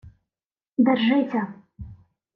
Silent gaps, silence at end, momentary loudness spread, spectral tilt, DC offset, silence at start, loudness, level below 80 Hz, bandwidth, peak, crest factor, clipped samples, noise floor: none; 0.4 s; 24 LU; -8.5 dB/octave; under 0.1%; 0.05 s; -22 LUFS; -54 dBFS; 5.4 kHz; -8 dBFS; 18 dB; under 0.1%; under -90 dBFS